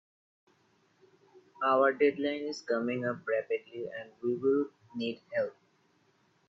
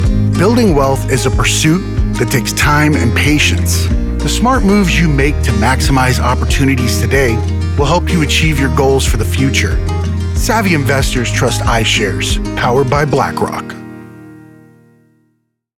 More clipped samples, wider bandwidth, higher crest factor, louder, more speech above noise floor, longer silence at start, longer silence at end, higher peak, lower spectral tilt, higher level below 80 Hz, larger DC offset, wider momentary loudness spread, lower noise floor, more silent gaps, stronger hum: neither; second, 7.6 kHz vs 17.5 kHz; first, 20 dB vs 10 dB; second, -32 LUFS vs -12 LUFS; second, 39 dB vs 52 dB; first, 1.6 s vs 0 s; second, 0.95 s vs 1.4 s; second, -12 dBFS vs -2 dBFS; about the same, -5.5 dB/octave vs -5 dB/octave; second, -82 dBFS vs -20 dBFS; neither; first, 12 LU vs 6 LU; first, -70 dBFS vs -63 dBFS; neither; neither